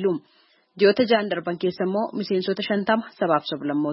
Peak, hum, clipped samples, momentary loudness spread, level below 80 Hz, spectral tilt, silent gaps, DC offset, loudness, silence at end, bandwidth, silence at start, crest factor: -6 dBFS; none; under 0.1%; 7 LU; -70 dBFS; -10 dB/octave; none; under 0.1%; -23 LUFS; 0 s; 5.8 kHz; 0 s; 18 dB